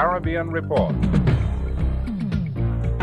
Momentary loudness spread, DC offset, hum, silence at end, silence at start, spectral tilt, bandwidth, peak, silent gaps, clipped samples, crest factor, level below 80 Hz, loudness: 5 LU; under 0.1%; none; 0 s; 0 s; -9 dB/octave; 8.6 kHz; -6 dBFS; none; under 0.1%; 14 dB; -28 dBFS; -23 LUFS